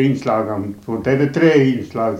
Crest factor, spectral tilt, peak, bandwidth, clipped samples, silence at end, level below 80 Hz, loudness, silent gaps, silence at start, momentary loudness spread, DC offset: 14 dB; -7.5 dB/octave; -2 dBFS; 10.5 kHz; under 0.1%; 0 s; -52 dBFS; -17 LUFS; none; 0 s; 11 LU; under 0.1%